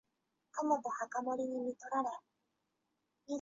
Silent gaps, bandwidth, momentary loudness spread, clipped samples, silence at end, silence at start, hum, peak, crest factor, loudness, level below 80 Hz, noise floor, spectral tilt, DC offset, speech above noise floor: none; 7.6 kHz; 9 LU; under 0.1%; 0 s; 0.55 s; none; -20 dBFS; 20 dB; -38 LUFS; -86 dBFS; -85 dBFS; -4 dB/octave; under 0.1%; 47 dB